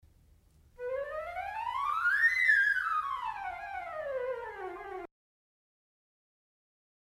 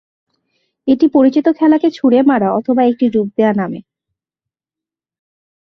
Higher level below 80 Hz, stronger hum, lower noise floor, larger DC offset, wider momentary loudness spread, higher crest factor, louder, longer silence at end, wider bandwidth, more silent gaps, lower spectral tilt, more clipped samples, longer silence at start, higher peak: about the same, -64 dBFS vs -60 dBFS; neither; second, -63 dBFS vs -88 dBFS; neither; first, 18 LU vs 8 LU; about the same, 18 dB vs 14 dB; second, -31 LUFS vs -13 LUFS; about the same, 2 s vs 1.95 s; first, 15.5 kHz vs 6.2 kHz; neither; second, -2.5 dB/octave vs -8.5 dB/octave; neither; about the same, 0.8 s vs 0.85 s; second, -16 dBFS vs -2 dBFS